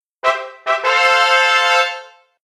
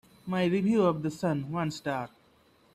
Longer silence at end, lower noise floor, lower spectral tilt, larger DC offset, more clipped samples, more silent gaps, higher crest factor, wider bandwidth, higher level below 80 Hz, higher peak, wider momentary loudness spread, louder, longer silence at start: second, 0.4 s vs 0.7 s; second, -35 dBFS vs -63 dBFS; second, 2 dB/octave vs -7 dB/octave; neither; neither; neither; about the same, 14 dB vs 16 dB; first, 14.5 kHz vs 13 kHz; about the same, -66 dBFS vs -66 dBFS; first, -2 dBFS vs -14 dBFS; about the same, 9 LU vs 9 LU; first, -14 LUFS vs -29 LUFS; about the same, 0.25 s vs 0.25 s